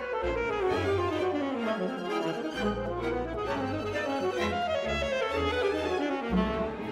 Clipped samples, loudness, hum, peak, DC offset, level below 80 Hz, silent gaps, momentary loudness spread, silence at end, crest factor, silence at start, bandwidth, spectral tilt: under 0.1%; -30 LUFS; none; -14 dBFS; under 0.1%; -46 dBFS; none; 4 LU; 0 s; 16 dB; 0 s; 14 kHz; -6 dB/octave